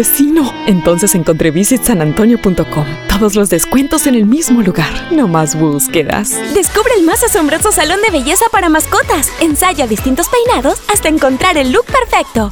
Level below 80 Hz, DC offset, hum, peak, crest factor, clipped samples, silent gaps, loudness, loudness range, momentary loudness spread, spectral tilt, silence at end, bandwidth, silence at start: -28 dBFS; 0.2%; none; 0 dBFS; 10 dB; under 0.1%; none; -11 LUFS; 1 LU; 3 LU; -4 dB/octave; 0 s; over 20 kHz; 0 s